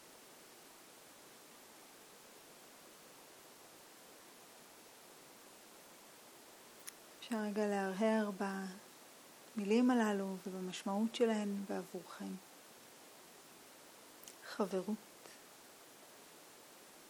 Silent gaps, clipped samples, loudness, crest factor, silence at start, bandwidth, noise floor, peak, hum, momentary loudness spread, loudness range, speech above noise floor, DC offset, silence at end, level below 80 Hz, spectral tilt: none; under 0.1%; -39 LUFS; 22 dB; 0 s; 20 kHz; -59 dBFS; -22 dBFS; none; 22 LU; 20 LU; 22 dB; under 0.1%; 0 s; -88 dBFS; -5 dB/octave